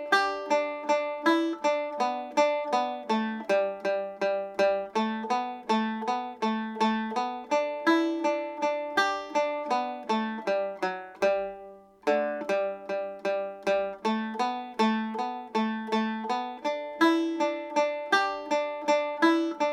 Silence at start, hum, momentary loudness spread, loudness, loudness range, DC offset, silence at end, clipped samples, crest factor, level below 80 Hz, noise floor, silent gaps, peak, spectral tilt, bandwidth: 0 s; none; 6 LU; -28 LUFS; 3 LU; under 0.1%; 0 s; under 0.1%; 20 dB; -72 dBFS; -48 dBFS; none; -8 dBFS; -4.5 dB/octave; 14.5 kHz